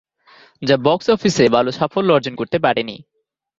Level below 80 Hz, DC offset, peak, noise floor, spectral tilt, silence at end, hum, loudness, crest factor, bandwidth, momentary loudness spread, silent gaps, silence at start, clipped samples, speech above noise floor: -54 dBFS; under 0.1%; 0 dBFS; -50 dBFS; -5.5 dB/octave; 0.65 s; none; -17 LUFS; 18 dB; 7.8 kHz; 9 LU; none; 0.6 s; under 0.1%; 33 dB